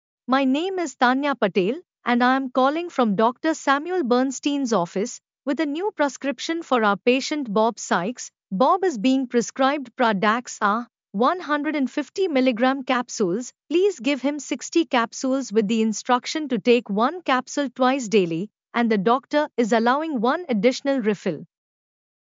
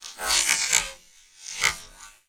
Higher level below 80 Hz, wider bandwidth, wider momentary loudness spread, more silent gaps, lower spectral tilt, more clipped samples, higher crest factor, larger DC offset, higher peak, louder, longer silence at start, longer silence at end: second, -86 dBFS vs -52 dBFS; second, 7.6 kHz vs over 20 kHz; second, 7 LU vs 17 LU; neither; first, -4.5 dB/octave vs 2 dB/octave; neither; second, 16 dB vs 28 dB; neither; second, -6 dBFS vs 0 dBFS; about the same, -22 LUFS vs -22 LUFS; first, 0.3 s vs 0 s; first, 0.85 s vs 0.2 s